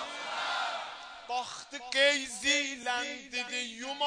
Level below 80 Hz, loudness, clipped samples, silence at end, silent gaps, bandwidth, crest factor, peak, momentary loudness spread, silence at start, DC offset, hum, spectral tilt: -70 dBFS; -31 LUFS; under 0.1%; 0 s; none; 10 kHz; 20 dB; -14 dBFS; 13 LU; 0 s; under 0.1%; none; 0.5 dB/octave